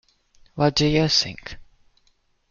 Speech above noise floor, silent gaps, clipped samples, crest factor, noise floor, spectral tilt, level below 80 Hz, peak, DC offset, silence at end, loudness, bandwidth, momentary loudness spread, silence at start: 43 dB; none; under 0.1%; 20 dB; -64 dBFS; -4.5 dB/octave; -46 dBFS; -4 dBFS; under 0.1%; 0.85 s; -20 LUFS; 7.4 kHz; 21 LU; 0.55 s